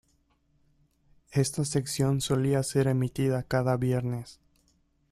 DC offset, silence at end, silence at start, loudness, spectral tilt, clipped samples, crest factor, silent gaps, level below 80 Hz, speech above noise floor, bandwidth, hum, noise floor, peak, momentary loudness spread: under 0.1%; 0.8 s; 1.3 s; -28 LUFS; -6 dB/octave; under 0.1%; 18 dB; none; -56 dBFS; 42 dB; 14.5 kHz; none; -69 dBFS; -12 dBFS; 6 LU